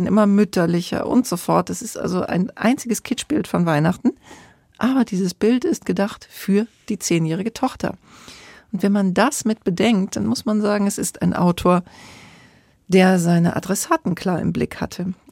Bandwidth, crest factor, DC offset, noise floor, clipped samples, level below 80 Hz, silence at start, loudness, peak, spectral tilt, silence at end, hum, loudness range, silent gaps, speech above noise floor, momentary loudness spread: 16.5 kHz; 16 dB; under 0.1%; -52 dBFS; under 0.1%; -52 dBFS; 0 s; -20 LUFS; -4 dBFS; -5.5 dB/octave; 0.2 s; none; 3 LU; none; 33 dB; 9 LU